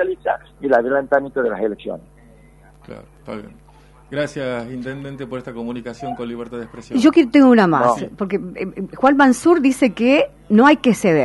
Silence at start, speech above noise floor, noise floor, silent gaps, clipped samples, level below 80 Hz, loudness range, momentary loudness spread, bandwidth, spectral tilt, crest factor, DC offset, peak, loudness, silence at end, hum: 0 s; 30 dB; -47 dBFS; none; under 0.1%; -50 dBFS; 14 LU; 18 LU; 11.5 kHz; -6 dB/octave; 16 dB; under 0.1%; -2 dBFS; -17 LUFS; 0 s; none